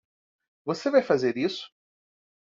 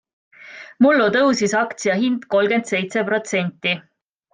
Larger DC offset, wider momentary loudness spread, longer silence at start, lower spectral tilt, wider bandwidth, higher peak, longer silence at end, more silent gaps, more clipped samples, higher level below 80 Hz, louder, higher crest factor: neither; first, 16 LU vs 8 LU; first, 0.65 s vs 0.45 s; about the same, -4 dB/octave vs -4.5 dB/octave; second, 7.6 kHz vs 9.8 kHz; second, -8 dBFS vs -4 dBFS; first, 0.85 s vs 0.55 s; neither; neither; second, -72 dBFS vs -66 dBFS; second, -25 LUFS vs -19 LUFS; about the same, 20 dB vs 16 dB